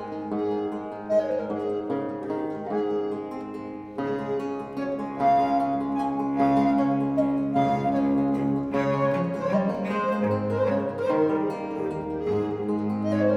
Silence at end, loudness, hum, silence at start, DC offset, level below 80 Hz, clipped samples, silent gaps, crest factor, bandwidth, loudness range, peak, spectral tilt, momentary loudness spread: 0 s; -26 LUFS; none; 0 s; under 0.1%; -56 dBFS; under 0.1%; none; 14 dB; 8 kHz; 6 LU; -10 dBFS; -8.5 dB/octave; 8 LU